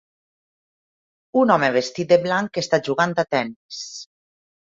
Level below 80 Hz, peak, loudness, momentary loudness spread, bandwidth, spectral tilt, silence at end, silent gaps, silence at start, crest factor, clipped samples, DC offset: -66 dBFS; -2 dBFS; -20 LUFS; 15 LU; 7.8 kHz; -5 dB/octave; 0.65 s; 3.56-3.69 s; 1.35 s; 20 dB; under 0.1%; under 0.1%